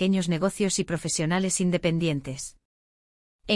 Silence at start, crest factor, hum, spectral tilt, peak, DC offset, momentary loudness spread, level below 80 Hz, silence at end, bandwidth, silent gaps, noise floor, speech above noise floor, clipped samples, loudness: 0 s; 16 dB; none; -4.5 dB/octave; -10 dBFS; under 0.1%; 12 LU; -54 dBFS; 0 s; 12 kHz; 2.65-3.39 s; under -90 dBFS; over 64 dB; under 0.1%; -26 LUFS